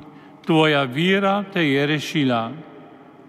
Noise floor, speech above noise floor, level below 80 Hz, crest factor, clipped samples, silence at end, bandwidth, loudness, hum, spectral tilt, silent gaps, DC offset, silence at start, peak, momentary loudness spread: -44 dBFS; 25 dB; -74 dBFS; 16 dB; under 0.1%; 0.45 s; 14.5 kHz; -19 LUFS; none; -6 dB/octave; none; under 0.1%; 0 s; -4 dBFS; 12 LU